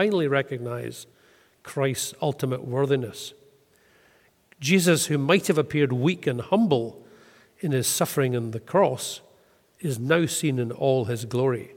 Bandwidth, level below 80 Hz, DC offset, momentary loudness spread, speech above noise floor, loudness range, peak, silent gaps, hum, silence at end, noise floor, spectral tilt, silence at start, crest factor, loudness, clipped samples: 17.5 kHz; -66 dBFS; under 0.1%; 13 LU; 37 dB; 6 LU; -6 dBFS; none; none; 0 s; -61 dBFS; -5 dB/octave; 0 s; 20 dB; -24 LUFS; under 0.1%